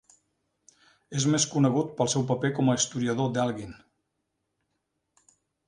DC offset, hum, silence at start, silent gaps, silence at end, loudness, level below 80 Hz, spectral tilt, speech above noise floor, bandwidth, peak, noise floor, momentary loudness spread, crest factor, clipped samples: under 0.1%; none; 1.1 s; none; 1.9 s; -26 LUFS; -64 dBFS; -4.5 dB/octave; 54 dB; 11 kHz; -8 dBFS; -80 dBFS; 8 LU; 20 dB; under 0.1%